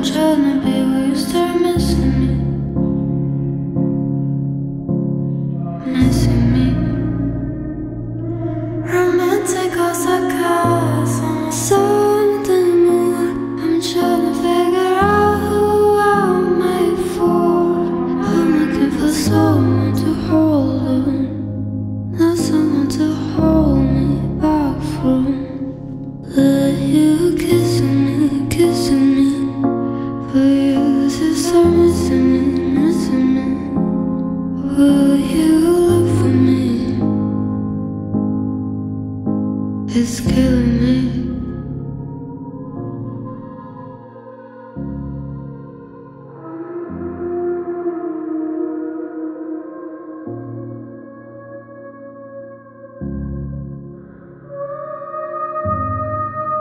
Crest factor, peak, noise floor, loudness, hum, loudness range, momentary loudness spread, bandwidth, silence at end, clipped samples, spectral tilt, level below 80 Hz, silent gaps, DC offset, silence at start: 16 dB; -2 dBFS; -38 dBFS; -17 LUFS; none; 15 LU; 16 LU; 16 kHz; 0 s; under 0.1%; -6.5 dB/octave; -34 dBFS; none; under 0.1%; 0 s